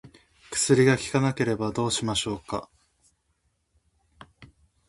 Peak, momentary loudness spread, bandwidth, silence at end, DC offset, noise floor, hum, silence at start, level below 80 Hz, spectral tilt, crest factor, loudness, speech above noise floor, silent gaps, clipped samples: -6 dBFS; 13 LU; 11.5 kHz; 0.45 s; under 0.1%; -72 dBFS; none; 0.05 s; -56 dBFS; -4.5 dB/octave; 22 dB; -25 LUFS; 48 dB; none; under 0.1%